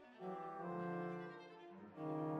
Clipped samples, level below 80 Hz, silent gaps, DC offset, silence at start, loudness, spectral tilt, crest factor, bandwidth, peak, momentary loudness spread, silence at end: under 0.1%; -88 dBFS; none; under 0.1%; 0 s; -48 LUFS; -9 dB/octave; 14 dB; 6.8 kHz; -32 dBFS; 12 LU; 0 s